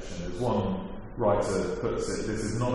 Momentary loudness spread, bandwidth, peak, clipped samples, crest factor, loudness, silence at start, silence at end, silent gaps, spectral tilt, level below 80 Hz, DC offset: 8 LU; 11.5 kHz; -14 dBFS; under 0.1%; 16 dB; -30 LUFS; 0 s; 0 s; none; -6 dB/octave; -42 dBFS; under 0.1%